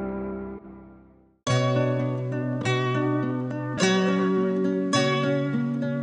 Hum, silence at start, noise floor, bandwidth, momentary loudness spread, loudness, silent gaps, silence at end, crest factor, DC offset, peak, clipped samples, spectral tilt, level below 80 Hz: none; 0 s; -54 dBFS; 10 kHz; 10 LU; -25 LUFS; none; 0 s; 18 dB; under 0.1%; -8 dBFS; under 0.1%; -6 dB/octave; -58 dBFS